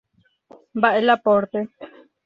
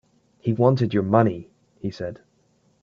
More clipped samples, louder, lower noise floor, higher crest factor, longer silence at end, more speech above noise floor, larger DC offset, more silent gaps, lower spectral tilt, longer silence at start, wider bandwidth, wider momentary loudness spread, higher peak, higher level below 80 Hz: neither; first, -19 LUFS vs -22 LUFS; second, -54 dBFS vs -63 dBFS; about the same, 20 dB vs 22 dB; second, 0.4 s vs 0.7 s; second, 35 dB vs 42 dB; neither; neither; second, -7 dB/octave vs -9.5 dB/octave; first, 0.75 s vs 0.45 s; about the same, 6.6 kHz vs 7 kHz; about the same, 15 LU vs 15 LU; about the same, -2 dBFS vs -2 dBFS; second, -66 dBFS vs -60 dBFS